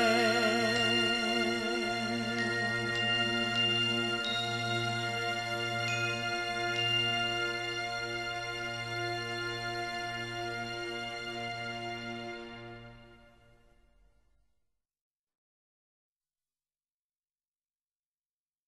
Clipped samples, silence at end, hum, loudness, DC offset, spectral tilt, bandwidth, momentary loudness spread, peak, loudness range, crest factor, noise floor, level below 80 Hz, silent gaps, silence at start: under 0.1%; 5.5 s; none; -31 LUFS; under 0.1%; -3.5 dB/octave; 13 kHz; 10 LU; -16 dBFS; 12 LU; 18 dB; under -90 dBFS; -62 dBFS; none; 0 s